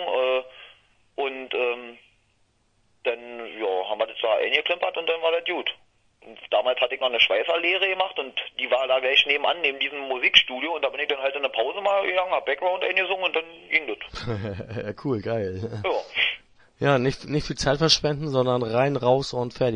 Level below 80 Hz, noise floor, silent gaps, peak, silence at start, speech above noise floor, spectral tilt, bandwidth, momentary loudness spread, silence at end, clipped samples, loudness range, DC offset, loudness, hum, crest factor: -52 dBFS; -66 dBFS; none; -2 dBFS; 0 s; 42 dB; -4 dB/octave; 10 kHz; 12 LU; 0 s; under 0.1%; 7 LU; under 0.1%; -24 LUFS; none; 24 dB